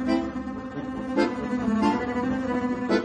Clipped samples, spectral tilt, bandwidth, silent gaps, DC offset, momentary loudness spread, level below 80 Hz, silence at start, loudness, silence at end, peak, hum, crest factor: under 0.1%; -6.5 dB/octave; 9.6 kHz; none; under 0.1%; 9 LU; -48 dBFS; 0 s; -27 LUFS; 0 s; -10 dBFS; none; 16 dB